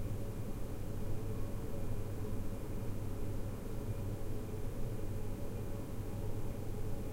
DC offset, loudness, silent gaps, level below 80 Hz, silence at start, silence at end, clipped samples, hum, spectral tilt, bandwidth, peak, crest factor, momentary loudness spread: under 0.1%; -43 LUFS; none; -42 dBFS; 0 s; 0 s; under 0.1%; none; -7 dB/octave; 16 kHz; -26 dBFS; 12 dB; 2 LU